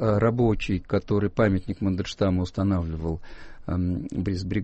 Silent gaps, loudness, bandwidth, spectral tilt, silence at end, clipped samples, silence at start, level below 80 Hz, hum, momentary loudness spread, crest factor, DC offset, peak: none; -26 LUFS; 8.4 kHz; -8 dB/octave; 0 s; under 0.1%; 0 s; -40 dBFS; none; 9 LU; 14 dB; under 0.1%; -10 dBFS